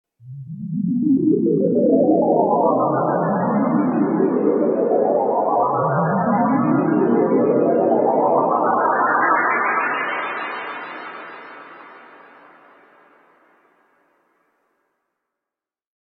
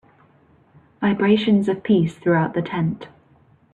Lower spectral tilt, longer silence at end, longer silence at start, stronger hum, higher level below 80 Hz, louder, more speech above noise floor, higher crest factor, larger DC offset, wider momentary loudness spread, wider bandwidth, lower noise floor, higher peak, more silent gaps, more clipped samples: first, -11.5 dB/octave vs -8 dB/octave; first, 4.05 s vs 0.65 s; second, 0.25 s vs 1 s; neither; second, -66 dBFS vs -60 dBFS; about the same, -18 LUFS vs -20 LUFS; first, 71 dB vs 36 dB; about the same, 16 dB vs 16 dB; neither; first, 14 LU vs 7 LU; second, 4.5 kHz vs 7.8 kHz; first, -88 dBFS vs -55 dBFS; about the same, -4 dBFS vs -4 dBFS; neither; neither